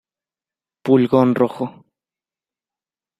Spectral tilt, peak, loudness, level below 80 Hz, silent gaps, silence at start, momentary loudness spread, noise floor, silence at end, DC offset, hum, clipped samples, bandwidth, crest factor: -9 dB/octave; -2 dBFS; -16 LUFS; -64 dBFS; none; 0.85 s; 15 LU; under -90 dBFS; 1.5 s; under 0.1%; none; under 0.1%; 5.8 kHz; 20 dB